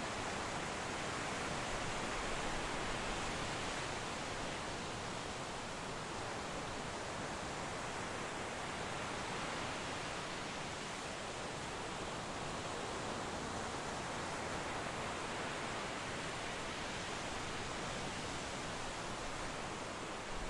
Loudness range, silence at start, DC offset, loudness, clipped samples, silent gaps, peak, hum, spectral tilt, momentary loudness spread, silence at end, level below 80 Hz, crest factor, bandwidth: 3 LU; 0 s; under 0.1%; -42 LUFS; under 0.1%; none; -28 dBFS; none; -3 dB/octave; 3 LU; 0 s; -56 dBFS; 14 dB; 11.5 kHz